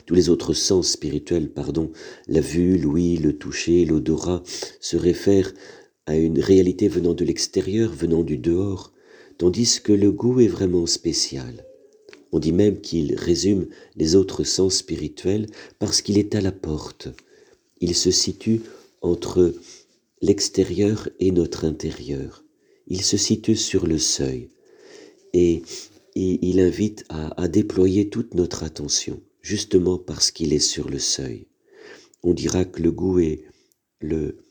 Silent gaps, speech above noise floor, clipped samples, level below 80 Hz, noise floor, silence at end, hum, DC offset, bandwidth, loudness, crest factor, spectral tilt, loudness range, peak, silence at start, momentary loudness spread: none; 42 dB; under 0.1%; -44 dBFS; -63 dBFS; 0.15 s; none; under 0.1%; over 20 kHz; -21 LUFS; 18 dB; -4.5 dB/octave; 3 LU; -4 dBFS; 0.05 s; 12 LU